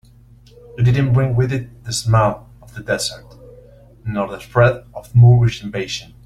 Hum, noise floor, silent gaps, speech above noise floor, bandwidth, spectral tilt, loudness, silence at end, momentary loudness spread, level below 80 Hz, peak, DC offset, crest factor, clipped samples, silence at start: none; -46 dBFS; none; 30 dB; 12.5 kHz; -6 dB/octave; -17 LUFS; 0.2 s; 20 LU; -42 dBFS; -2 dBFS; under 0.1%; 16 dB; under 0.1%; 0.75 s